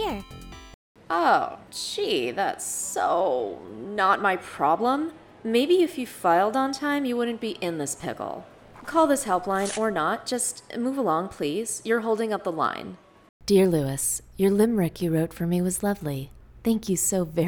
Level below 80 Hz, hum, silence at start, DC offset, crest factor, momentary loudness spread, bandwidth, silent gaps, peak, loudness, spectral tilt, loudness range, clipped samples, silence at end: -54 dBFS; none; 0 s; under 0.1%; 18 dB; 12 LU; over 20 kHz; 0.74-0.95 s, 13.29-13.40 s; -8 dBFS; -25 LUFS; -4.5 dB/octave; 2 LU; under 0.1%; 0 s